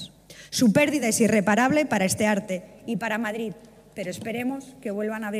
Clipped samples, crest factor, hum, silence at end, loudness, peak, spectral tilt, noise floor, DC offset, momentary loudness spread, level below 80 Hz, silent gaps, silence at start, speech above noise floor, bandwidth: under 0.1%; 18 dB; 50 Hz at -60 dBFS; 0 s; -24 LUFS; -6 dBFS; -4.5 dB/octave; -46 dBFS; under 0.1%; 14 LU; -60 dBFS; none; 0 s; 22 dB; 15.5 kHz